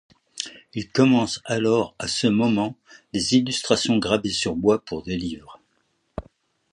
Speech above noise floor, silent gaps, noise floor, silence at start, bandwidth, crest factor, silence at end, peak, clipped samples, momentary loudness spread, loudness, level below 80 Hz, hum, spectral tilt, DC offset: 47 dB; none; -69 dBFS; 0.35 s; 11 kHz; 20 dB; 0.5 s; -2 dBFS; under 0.1%; 14 LU; -22 LUFS; -52 dBFS; none; -4.5 dB/octave; under 0.1%